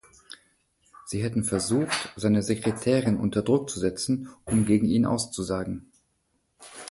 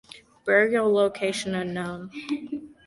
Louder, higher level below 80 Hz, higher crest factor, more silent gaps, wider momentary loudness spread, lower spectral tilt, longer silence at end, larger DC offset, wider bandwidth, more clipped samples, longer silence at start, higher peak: about the same, -26 LUFS vs -25 LUFS; first, -52 dBFS vs -62 dBFS; about the same, 18 dB vs 20 dB; neither; first, 21 LU vs 14 LU; about the same, -5.5 dB/octave vs -5 dB/octave; second, 0 s vs 0.15 s; neither; about the same, 11.5 kHz vs 11.5 kHz; neither; first, 0.3 s vs 0.15 s; second, -10 dBFS vs -6 dBFS